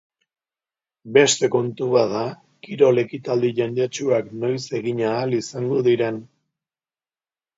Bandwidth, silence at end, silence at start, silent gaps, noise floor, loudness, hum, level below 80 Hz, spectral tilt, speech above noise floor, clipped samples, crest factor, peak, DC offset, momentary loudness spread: 7.8 kHz; 1.35 s; 1.05 s; none; under -90 dBFS; -21 LUFS; none; -68 dBFS; -4.5 dB/octave; over 70 dB; under 0.1%; 20 dB; -2 dBFS; under 0.1%; 9 LU